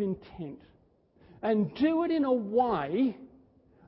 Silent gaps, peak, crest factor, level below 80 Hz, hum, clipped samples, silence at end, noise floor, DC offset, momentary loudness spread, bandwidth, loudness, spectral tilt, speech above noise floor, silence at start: none; -14 dBFS; 16 dB; -62 dBFS; none; under 0.1%; 0.6 s; -63 dBFS; under 0.1%; 16 LU; 5.8 kHz; -29 LUFS; -11 dB/octave; 35 dB; 0 s